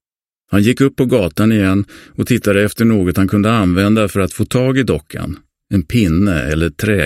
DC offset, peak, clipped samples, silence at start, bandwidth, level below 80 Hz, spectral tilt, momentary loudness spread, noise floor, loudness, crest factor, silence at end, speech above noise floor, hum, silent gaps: under 0.1%; 0 dBFS; under 0.1%; 0.5 s; 16 kHz; -34 dBFS; -6.5 dB/octave; 7 LU; -70 dBFS; -14 LUFS; 14 dB; 0 s; 56 dB; none; none